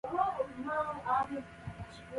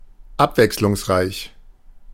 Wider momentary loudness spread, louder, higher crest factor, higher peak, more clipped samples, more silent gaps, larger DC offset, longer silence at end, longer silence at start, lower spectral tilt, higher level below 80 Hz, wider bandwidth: second, 13 LU vs 17 LU; second, -35 LUFS vs -19 LUFS; about the same, 18 dB vs 20 dB; second, -18 dBFS vs 0 dBFS; neither; neither; neither; about the same, 0 s vs 0 s; second, 0.05 s vs 0.2 s; first, -6.5 dB/octave vs -5 dB/octave; second, -60 dBFS vs -42 dBFS; second, 11.5 kHz vs 17 kHz